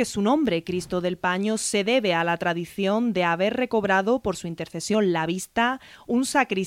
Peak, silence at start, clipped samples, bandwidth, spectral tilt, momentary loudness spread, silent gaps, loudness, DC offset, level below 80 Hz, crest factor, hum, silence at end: -8 dBFS; 0 s; under 0.1%; 16 kHz; -4.5 dB/octave; 6 LU; none; -24 LUFS; under 0.1%; -56 dBFS; 16 dB; none; 0 s